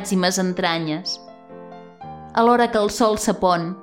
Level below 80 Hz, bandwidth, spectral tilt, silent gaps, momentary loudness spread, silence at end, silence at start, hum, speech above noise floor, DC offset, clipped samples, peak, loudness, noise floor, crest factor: -52 dBFS; 16.5 kHz; -4.5 dB/octave; none; 22 LU; 0 s; 0 s; none; 21 dB; under 0.1%; under 0.1%; -4 dBFS; -20 LUFS; -40 dBFS; 16 dB